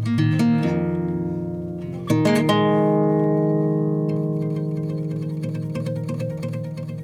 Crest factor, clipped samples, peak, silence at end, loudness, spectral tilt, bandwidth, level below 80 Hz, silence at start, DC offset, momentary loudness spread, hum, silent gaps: 16 dB; under 0.1%; -6 dBFS; 0 s; -22 LUFS; -8 dB/octave; 13.5 kHz; -54 dBFS; 0 s; under 0.1%; 10 LU; none; none